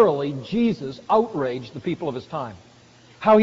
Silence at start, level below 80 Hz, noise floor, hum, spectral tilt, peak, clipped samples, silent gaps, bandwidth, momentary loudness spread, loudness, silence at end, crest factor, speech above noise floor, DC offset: 0 s; -58 dBFS; -51 dBFS; none; -5.5 dB/octave; -4 dBFS; under 0.1%; none; 7.6 kHz; 11 LU; -24 LUFS; 0 s; 18 dB; 28 dB; under 0.1%